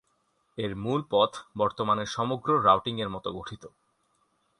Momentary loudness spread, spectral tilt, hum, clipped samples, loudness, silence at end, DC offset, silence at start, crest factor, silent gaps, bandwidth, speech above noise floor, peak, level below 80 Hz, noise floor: 16 LU; -5.5 dB/octave; none; under 0.1%; -27 LUFS; 0.9 s; under 0.1%; 0.55 s; 22 dB; none; 11 kHz; 45 dB; -8 dBFS; -60 dBFS; -72 dBFS